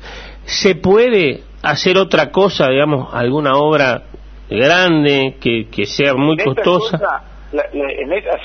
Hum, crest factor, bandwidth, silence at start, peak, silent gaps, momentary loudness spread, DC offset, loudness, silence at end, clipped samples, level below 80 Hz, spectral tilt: none; 14 dB; 6.6 kHz; 0 s; 0 dBFS; none; 10 LU; under 0.1%; -14 LUFS; 0 s; under 0.1%; -40 dBFS; -5 dB/octave